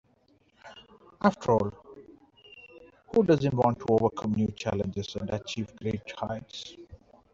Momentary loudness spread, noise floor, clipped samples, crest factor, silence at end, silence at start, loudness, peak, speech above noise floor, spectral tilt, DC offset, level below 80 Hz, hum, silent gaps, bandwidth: 25 LU; -66 dBFS; under 0.1%; 20 dB; 0.4 s; 0.65 s; -28 LUFS; -8 dBFS; 38 dB; -7 dB/octave; under 0.1%; -58 dBFS; none; none; 7.6 kHz